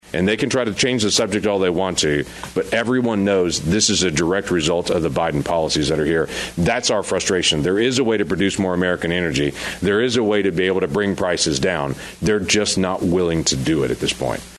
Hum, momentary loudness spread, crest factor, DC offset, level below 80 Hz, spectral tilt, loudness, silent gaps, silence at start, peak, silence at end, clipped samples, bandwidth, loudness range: none; 4 LU; 16 dB; under 0.1%; -42 dBFS; -4 dB/octave; -19 LUFS; none; 0.05 s; -4 dBFS; 0 s; under 0.1%; 12.5 kHz; 1 LU